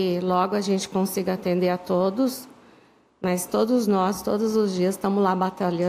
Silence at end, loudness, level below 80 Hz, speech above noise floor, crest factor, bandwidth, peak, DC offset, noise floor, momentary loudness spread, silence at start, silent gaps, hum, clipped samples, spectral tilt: 0 s; -24 LUFS; -62 dBFS; 33 dB; 16 dB; 16 kHz; -8 dBFS; under 0.1%; -56 dBFS; 4 LU; 0 s; none; none; under 0.1%; -6 dB/octave